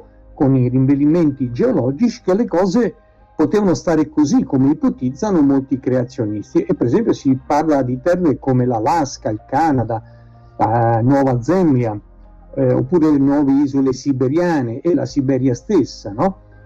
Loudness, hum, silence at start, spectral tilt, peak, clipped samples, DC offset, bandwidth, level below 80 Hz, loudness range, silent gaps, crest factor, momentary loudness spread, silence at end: -17 LUFS; none; 0.35 s; -8 dB/octave; -6 dBFS; under 0.1%; under 0.1%; 7.8 kHz; -44 dBFS; 1 LU; none; 10 dB; 6 LU; 0.3 s